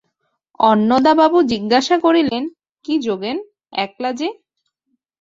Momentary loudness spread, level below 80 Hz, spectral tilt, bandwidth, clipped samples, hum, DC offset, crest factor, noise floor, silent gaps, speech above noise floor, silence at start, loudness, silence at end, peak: 13 LU; -58 dBFS; -5 dB/octave; 7.8 kHz; under 0.1%; none; under 0.1%; 16 dB; -73 dBFS; 2.71-2.75 s; 57 dB; 0.6 s; -17 LUFS; 0.9 s; -2 dBFS